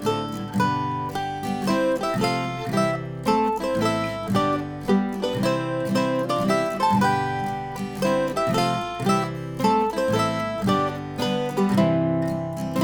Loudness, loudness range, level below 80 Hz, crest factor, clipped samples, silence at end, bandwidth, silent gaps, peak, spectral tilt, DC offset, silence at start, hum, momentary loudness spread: -24 LUFS; 1 LU; -52 dBFS; 16 dB; under 0.1%; 0 s; over 20 kHz; none; -8 dBFS; -6 dB/octave; under 0.1%; 0 s; none; 6 LU